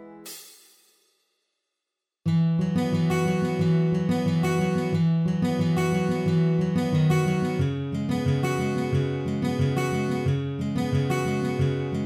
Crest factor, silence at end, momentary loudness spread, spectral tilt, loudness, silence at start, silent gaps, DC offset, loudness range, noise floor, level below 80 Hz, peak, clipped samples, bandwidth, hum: 12 dB; 0 s; 5 LU; -7.5 dB/octave; -25 LUFS; 0 s; none; under 0.1%; 2 LU; -85 dBFS; -52 dBFS; -12 dBFS; under 0.1%; 15 kHz; none